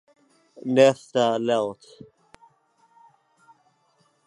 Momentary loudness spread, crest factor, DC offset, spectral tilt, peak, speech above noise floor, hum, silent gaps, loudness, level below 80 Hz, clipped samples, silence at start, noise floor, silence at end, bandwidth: 16 LU; 22 dB; under 0.1%; -5 dB/octave; -4 dBFS; 44 dB; none; none; -22 LUFS; -74 dBFS; under 0.1%; 0.65 s; -66 dBFS; 2.55 s; 11 kHz